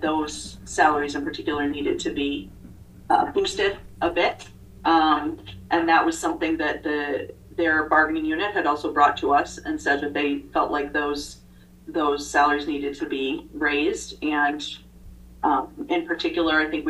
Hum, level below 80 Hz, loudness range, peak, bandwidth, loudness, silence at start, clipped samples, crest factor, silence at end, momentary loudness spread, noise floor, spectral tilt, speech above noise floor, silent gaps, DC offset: 60 Hz at -55 dBFS; -48 dBFS; 3 LU; -4 dBFS; 12.5 kHz; -23 LUFS; 0 s; under 0.1%; 20 dB; 0 s; 11 LU; -45 dBFS; -3.5 dB/octave; 22 dB; none; under 0.1%